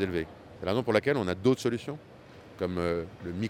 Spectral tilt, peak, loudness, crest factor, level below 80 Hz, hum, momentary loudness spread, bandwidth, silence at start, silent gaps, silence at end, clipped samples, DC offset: -6.5 dB/octave; -10 dBFS; -30 LUFS; 20 dB; -56 dBFS; none; 15 LU; 15 kHz; 0 s; none; 0 s; under 0.1%; under 0.1%